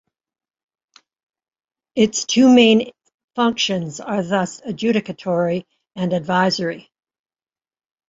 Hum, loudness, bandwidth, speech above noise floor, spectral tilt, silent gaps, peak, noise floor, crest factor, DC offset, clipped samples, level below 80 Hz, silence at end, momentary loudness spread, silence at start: none; -18 LUFS; 8 kHz; over 72 dB; -4.5 dB/octave; 3.14-3.28 s; -2 dBFS; under -90 dBFS; 18 dB; under 0.1%; under 0.1%; -62 dBFS; 1.3 s; 15 LU; 1.95 s